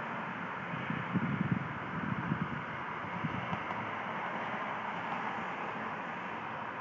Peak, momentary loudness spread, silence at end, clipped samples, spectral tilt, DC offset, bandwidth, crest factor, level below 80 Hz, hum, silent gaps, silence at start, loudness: -18 dBFS; 5 LU; 0 s; under 0.1%; -7.5 dB/octave; under 0.1%; 7.6 kHz; 18 dB; -64 dBFS; none; none; 0 s; -37 LUFS